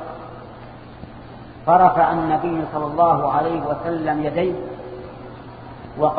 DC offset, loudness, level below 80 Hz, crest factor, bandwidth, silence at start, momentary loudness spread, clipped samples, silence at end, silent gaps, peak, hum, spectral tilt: under 0.1%; -19 LUFS; -48 dBFS; 20 dB; 4.9 kHz; 0 s; 24 LU; under 0.1%; 0 s; none; -2 dBFS; none; -10.5 dB/octave